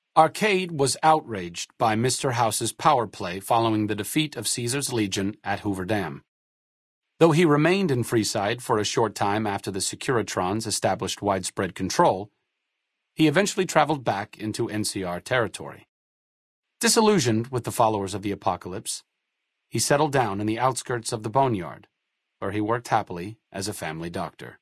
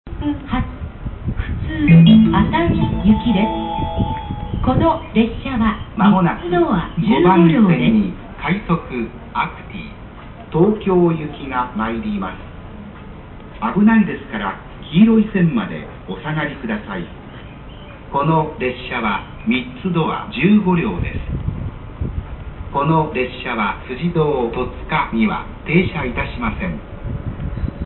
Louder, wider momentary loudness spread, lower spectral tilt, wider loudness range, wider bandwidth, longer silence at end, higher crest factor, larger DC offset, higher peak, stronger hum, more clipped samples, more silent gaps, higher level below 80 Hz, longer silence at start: second, -24 LUFS vs -18 LUFS; second, 12 LU vs 18 LU; second, -4.5 dB/octave vs -12.5 dB/octave; second, 4 LU vs 7 LU; first, 12 kHz vs 4.2 kHz; about the same, 0.05 s vs 0 s; first, 22 dB vs 16 dB; neither; about the same, -2 dBFS vs -2 dBFS; neither; neither; first, 6.28-7.01 s, 15.89-16.63 s vs none; second, -62 dBFS vs -32 dBFS; about the same, 0.15 s vs 0.05 s